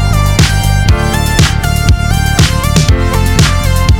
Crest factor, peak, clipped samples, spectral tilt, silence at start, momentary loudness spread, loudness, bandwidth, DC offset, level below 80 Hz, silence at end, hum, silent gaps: 8 dB; 0 dBFS; 0.8%; -4.5 dB/octave; 0 s; 2 LU; -10 LUFS; 19.5 kHz; under 0.1%; -14 dBFS; 0 s; none; none